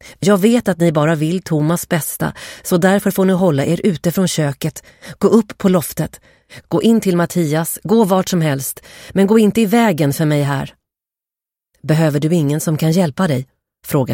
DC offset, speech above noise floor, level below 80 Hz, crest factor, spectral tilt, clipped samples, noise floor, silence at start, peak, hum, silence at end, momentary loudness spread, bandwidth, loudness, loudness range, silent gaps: under 0.1%; 73 dB; -50 dBFS; 14 dB; -6 dB/octave; under 0.1%; -88 dBFS; 0.05 s; 0 dBFS; none; 0 s; 10 LU; 17 kHz; -16 LUFS; 3 LU; none